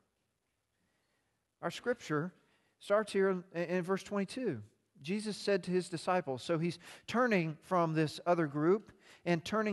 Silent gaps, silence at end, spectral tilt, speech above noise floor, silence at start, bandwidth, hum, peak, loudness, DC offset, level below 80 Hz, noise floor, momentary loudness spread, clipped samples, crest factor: none; 0 s; -6 dB/octave; 49 dB; 1.6 s; 12.5 kHz; none; -18 dBFS; -35 LUFS; under 0.1%; -76 dBFS; -83 dBFS; 10 LU; under 0.1%; 18 dB